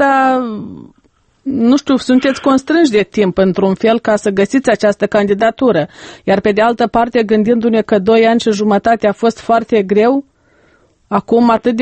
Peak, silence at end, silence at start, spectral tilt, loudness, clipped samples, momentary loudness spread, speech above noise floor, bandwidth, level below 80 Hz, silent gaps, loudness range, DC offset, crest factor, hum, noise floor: 0 dBFS; 0 s; 0 s; -6 dB/octave; -12 LUFS; under 0.1%; 6 LU; 42 dB; 8.8 kHz; -48 dBFS; none; 2 LU; under 0.1%; 12 dB; none; -54 dBFS